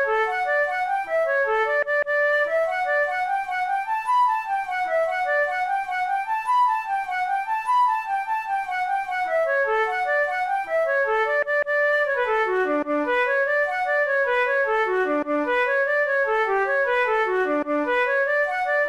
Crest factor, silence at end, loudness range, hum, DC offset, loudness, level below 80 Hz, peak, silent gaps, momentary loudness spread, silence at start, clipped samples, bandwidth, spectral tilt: 10 dB; 0 s; 2 LU; none; 0.1%; -22 LUFS; -60 dBFS; -12 dBFS; none; 4 LU; 0 s; under 0.1%; 13 kHz; -3 dB/octave